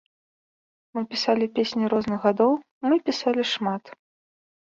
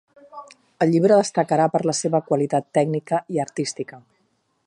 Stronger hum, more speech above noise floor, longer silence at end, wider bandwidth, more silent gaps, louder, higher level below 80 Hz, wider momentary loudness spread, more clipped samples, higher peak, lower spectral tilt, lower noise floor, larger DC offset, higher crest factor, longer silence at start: neither; first, over 67 dB vs 48 dB; about the same, 0.75 s vs 0.7 s; second, 7.8 kHz vs 11.5 kHz; first, 2.71-2.81 s vs none; second, -24 LUFS vs -21 LUFS; about the same, -66 dBFS vs -70 dBFS; second, 8 LU vs 17 LU; neither; about the same, -6 dBFS vs -4 dBFS; about the same, -5 dB/octave vs -5.5 dB/octave; first, under -90 dBFS vs -68 dBFS; neither; about the same, 18 dB vs 18 dB; first, 0.95 s vs 0.35 s